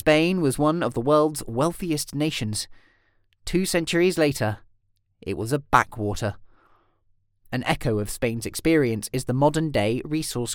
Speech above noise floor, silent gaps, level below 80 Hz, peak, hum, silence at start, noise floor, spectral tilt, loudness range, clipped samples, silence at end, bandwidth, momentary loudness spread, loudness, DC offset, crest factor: 43 dB; none; -44 dBFS; -2 dBFS; none; 0.05 s; -66 dBFS; -5 dB/octave; 3 LU; under 0.1%; 0 s; 18 kHz; 10 LU; -24 LUFS; under 0.1%; 22 dB